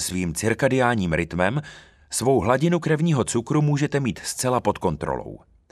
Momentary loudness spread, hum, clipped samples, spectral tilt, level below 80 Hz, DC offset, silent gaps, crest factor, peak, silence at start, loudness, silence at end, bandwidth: 9 LU; none; under 0.1%; -5.5 dB/octave; -46 dBFS; under 0.1%; none; 18 dB; -4 dBFS; 0 s; -23 LUFS; 0.35 s; 14 kHz